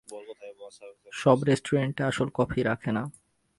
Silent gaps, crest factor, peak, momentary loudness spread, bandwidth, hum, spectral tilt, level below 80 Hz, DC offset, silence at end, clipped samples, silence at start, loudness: none; 22 dB; -6 dBFS; 21 LU; 11.5 kHz; none; -6.5 dB/octave; -56 dBFS; under 0.1%; 0.5 s; under 0.1%; 0.1 s; -27 LUFS